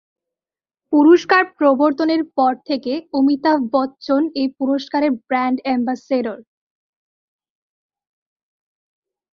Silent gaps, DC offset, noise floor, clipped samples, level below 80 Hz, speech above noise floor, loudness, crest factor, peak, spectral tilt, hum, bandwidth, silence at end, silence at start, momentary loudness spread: none; under 0.1%; under -90 dBFS; under 0.1%; -66 dBFS; over 73 dB; -17 LUFS; 18 dB; -2 dBFS; -5 dB/octave; none; 6.8 kHz; 2.95 s; 0.9 s; 9 LU